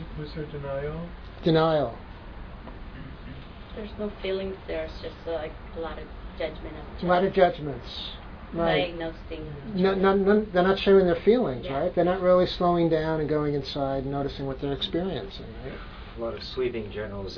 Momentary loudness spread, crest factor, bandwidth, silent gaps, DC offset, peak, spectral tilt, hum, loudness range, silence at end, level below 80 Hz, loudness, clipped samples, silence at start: 20 LU; 20 dB; 5.4 kHz; none; under 0.1%; -6 dBFS; -8 dB/octave; none; 12 LU; 0 s; -42 dBFS; -26 LUFS; under 0.1%; 0 s